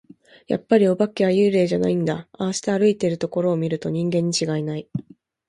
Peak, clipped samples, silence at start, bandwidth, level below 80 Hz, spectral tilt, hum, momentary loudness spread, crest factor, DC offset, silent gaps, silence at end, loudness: -4 dBFS; under 0.1%; 0.5 s; 11.5 kHz; -60 dBFS; -6 dB/octave; none; 10 LU; 18 dB; under 0.1%; none; 0.45 s; -21 LUFS